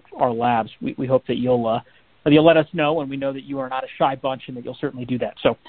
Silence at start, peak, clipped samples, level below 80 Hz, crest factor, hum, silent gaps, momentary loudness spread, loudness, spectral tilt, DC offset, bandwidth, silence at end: 0.1 s; -2 dBFS; under 0.1%; -56 dBFS; 18 dB; none; none; 13 LU; -21 LUFS; -11 dB/octave; 0.1%; 4.5 kHz; 0.15 s